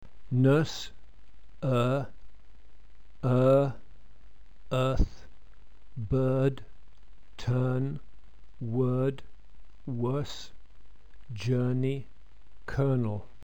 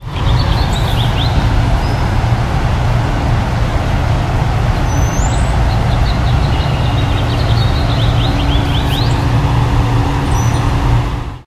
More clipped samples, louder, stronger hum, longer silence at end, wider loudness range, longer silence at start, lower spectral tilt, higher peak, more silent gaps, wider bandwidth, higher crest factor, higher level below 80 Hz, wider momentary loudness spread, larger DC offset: neither; second, -29 LUFS vs -14 LUFS; neither; first, 0.2 s vs 0.05 s; first, 4 LU vs 1 LU; first, 0.15 s vs 0 s; first, -8 dB/octave vs -6 dB/octave; second, -12 dBFS vs 0 dBFS; neither; second, 8.6 kHz vs 13.5 kHz; first, 18 dB vs 12 dB; second, -44 dBFS vs -18 dBFS; first, 19 LU vs 2 LU; first, 1% vs under 0.1%